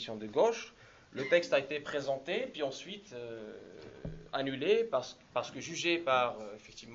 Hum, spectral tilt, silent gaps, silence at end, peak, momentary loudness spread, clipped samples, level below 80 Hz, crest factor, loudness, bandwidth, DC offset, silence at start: none; -4 dB/octave; none; 0 s; -14 dBFS; 18 LU; under 0.1%; -64 dBFS; 20 dB; -33 LUFS; 7.8 kHz; under 0.1%; 0 s